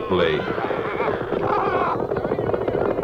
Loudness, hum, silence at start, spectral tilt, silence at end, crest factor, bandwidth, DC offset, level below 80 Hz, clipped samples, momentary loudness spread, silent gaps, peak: -23 LUFS; none; 0 s; -7.5 dB/octave; 0 s; 14 dB; 7 kHz; under 0.1%; -44 dBFS; under 0.1%; 4 LU; none; -8 dBFS